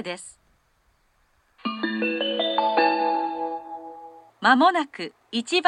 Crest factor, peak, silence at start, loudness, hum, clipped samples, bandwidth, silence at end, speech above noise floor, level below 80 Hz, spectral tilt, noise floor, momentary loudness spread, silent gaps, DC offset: 22 dB; -2 dBFS; 0 s; -23 LUFS; none; under 0.1%; 11 kHz; 0 s; 43 dB; -72 dBFS; -3.5 dB/octave; -65 dBFS; 20 LU; none; under 0.1%